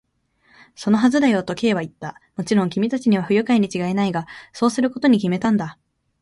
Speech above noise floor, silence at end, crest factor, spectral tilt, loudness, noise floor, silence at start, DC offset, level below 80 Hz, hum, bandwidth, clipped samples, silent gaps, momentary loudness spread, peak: 42 dB; 0.5 s; 16 dB; -6 dB/octave; -20 LUFS; -61 dBFS; 0.8 s; under 0.1%; -60 dBFS; none; 11.5 kHz; under 0.1%; none; 14 LU; -4 dBFS